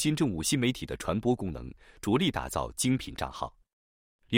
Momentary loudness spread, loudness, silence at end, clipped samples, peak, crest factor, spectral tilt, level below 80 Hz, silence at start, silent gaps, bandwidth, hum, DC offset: 11 LU; -30 LUFS; 0 s; under 0.1%; -8 dBFS; 22 dB; -4.5 dB/octave; -50 dBFS; 0 s; 3.73-4.19 s; 16 kHz; none; under 0.1%